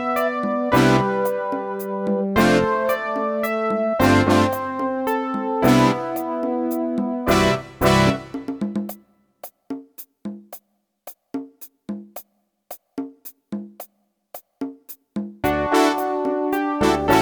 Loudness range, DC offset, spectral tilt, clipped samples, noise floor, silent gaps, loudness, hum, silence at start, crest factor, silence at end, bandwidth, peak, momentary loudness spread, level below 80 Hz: 17 LU; under 0.1%; -5.5 dB/octave; under 0.1%; -60 dBFS; none; -20 LUFS; none; 0 s; 18 dB; 0 s; over 20 kHz; -4 dBFS; 23 LU; -44 dBFS